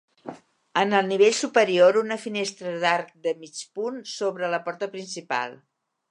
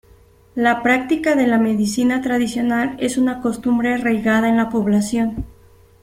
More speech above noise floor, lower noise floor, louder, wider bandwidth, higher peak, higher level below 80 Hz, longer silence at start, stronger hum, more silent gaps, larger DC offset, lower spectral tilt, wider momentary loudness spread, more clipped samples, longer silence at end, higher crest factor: second, 19 dB vs 32 dB; second, -42 dBFS vs -49 dBFS; second, -24 LUFS vs -18 LUFS; second, 11 kHz vs 15 kHz; about the same, -4 dBFS vs -2 dBFS; second, -82 dBFS vs -46 dBFS; second, 0.25 s vs 0.55 s; neither; neither; neither; second, -3.5 dB/octave vs -5.5 dB/octave; first, 16 LU vs 5 LU; neither; about the same, 0.55 s vs 0.5 s; about the same, 20 dB vs 16 dB